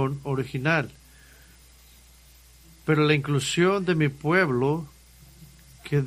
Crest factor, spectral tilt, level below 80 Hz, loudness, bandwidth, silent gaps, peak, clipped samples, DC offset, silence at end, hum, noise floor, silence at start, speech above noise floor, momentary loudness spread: 18 dB; -6 dB/octave; -54 dBFS; -24 LUFS; 15.5 kHz; none; -8 dBFS; under 0.1%; under 0.1%; 0 s; none; -53 dBFS; 0 s; 29 dB; 12 LU